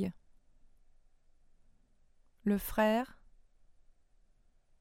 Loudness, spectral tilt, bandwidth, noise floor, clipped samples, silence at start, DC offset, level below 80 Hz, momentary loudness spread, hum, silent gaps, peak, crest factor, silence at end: -33 LUFS; -6 dB/octave; 16 kHz; -67 dBFS; under 0.1%; 0 s; under 0.1%; -58 dBFS; 10 LU; none; none; -16 dBFS; 24 dB; 1.75 s